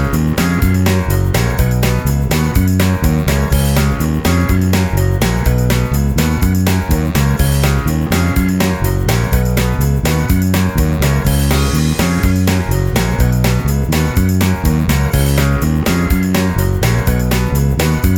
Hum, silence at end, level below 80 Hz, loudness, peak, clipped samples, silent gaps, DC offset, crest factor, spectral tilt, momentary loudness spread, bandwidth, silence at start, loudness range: none; 0 s; -20 dBFS; -14 LUFS; 0 dBFS; under 0.1%; none; under 0.1%; 12 dB; -6 dB/octave; 2 LU; over 20 kHz; 0 s; 0 LU